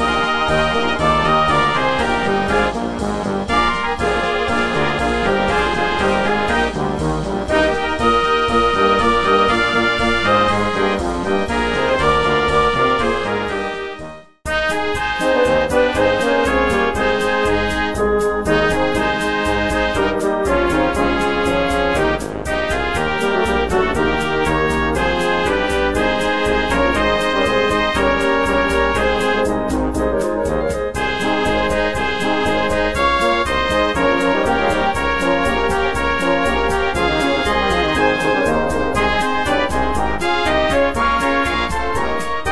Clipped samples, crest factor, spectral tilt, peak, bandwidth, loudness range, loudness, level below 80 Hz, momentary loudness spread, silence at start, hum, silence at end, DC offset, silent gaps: under 0.1%; 16 dB; -5 dB/octave; -2 dBFS; 11 kHz; 2 LU; -17 LUFS; -32 dBFS; 5 LU; 0 s; none; 0 s; under 0.1%; none